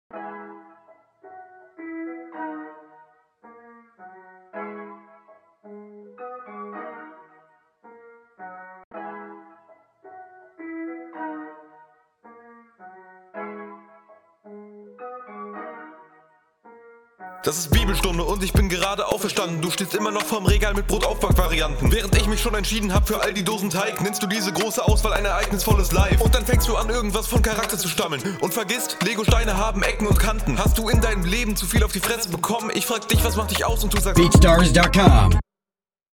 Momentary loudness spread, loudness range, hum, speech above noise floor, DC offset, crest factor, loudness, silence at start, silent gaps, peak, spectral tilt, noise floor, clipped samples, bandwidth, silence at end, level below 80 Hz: 21 LU; 21 LU; none; over 71 dB; under 0.1%; 22 dB; -21 LUFS; 0.15 s; 8.84-8.91 s; 0 dBFS; -4.5 dB/octave; under -90 dBFS; under 0.1%; 19 kHz; 0.7 s; -26 dBFS